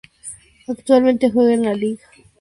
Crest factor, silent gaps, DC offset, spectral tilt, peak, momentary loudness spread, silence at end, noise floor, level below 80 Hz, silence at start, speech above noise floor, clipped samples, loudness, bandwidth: 16 dB; none; under 0.1%; -5.5 dB/octave; -2 dBFS; 20 LU; 0.45 s; -39 dBFS; -56 dBFS; 0.25 s; 23 dB; under 0.1%; -17 LUFS; 11.5 kHz